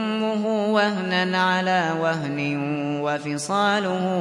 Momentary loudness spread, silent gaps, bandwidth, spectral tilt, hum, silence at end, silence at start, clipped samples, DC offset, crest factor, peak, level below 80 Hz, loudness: 5 LU; none; 11.5 kHz; -5 dB/octave; none; 0 s; 0 s; under 0.1%; under 0.1%; 16 dB; -8 dBFS; -70 dBFS; -22 LUFS